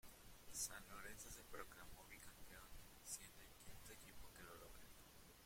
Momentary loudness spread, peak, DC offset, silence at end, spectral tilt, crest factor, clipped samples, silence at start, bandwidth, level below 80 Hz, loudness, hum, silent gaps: 14 LU; -34 dBFS; under 0.1%; 0 s; -1.5 dB/octave; 24 dB; under 0.1%; 0.05 s; 16.5 kHz; -68 dBFS; -57 LUFS; none; none